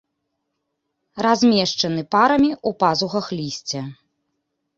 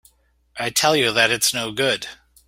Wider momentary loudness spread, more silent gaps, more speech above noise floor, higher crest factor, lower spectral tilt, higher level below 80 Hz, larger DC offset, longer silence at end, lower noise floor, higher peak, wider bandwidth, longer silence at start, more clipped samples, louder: about the same, 12 LU vs 13 LU; neither; first, 57 dB vs 39 dB; about the same, 18 dB vs 22 dB; first, -4.5 dB/octave vs -1.5 dB/octave; about the same, -58 dBFS vs -58 dBFS; neither; first, 0.85 s vs 0.35 s; first, -76 dBFS vs -59 dBFS; about the same, -2 dBFS vs 0 dBFS; second, 7.8 kHz vs 16.5 kHz; first, 1.15 s vs 0.55 s; neither; about the same, -19 LUFS vs -19 LUFS